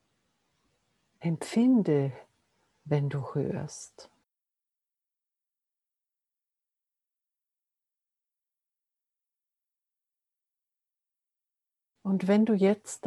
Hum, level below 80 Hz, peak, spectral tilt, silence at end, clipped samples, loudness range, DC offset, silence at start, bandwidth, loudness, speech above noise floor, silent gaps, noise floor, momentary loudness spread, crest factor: none; -78 dBFS; -12 dBFS; -7 dB/octave; 0 s; under 0.1%; 11 LU; under 0.1%; 1.2 s; 12 kHz; -28 LUFS; 62 dB; none; -89 dBFS; 15 LU; 20 dB